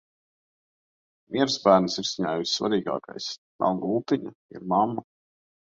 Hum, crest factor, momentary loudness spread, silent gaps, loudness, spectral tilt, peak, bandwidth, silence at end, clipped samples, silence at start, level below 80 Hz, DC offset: none; 24 dB; 14 LU; 3.38-3.59 s, 4.35-4.49 s; -25 LUFS; -4.5 dB/octave; -4 dBFS; 7.8 kHz; 0.65 s; under 0.1%; 1.3 s; -66 dBFS; under 0.1%